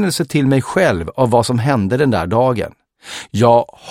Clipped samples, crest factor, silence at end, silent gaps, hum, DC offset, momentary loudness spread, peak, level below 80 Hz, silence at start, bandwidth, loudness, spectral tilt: under 0.1%; 16 dB; 0 s; none; none; under 0.1%; 11 LU; 0 dBFS; -44 dBFS; 0 s; 16 kHz; -15 LUFS; -6 dB/octave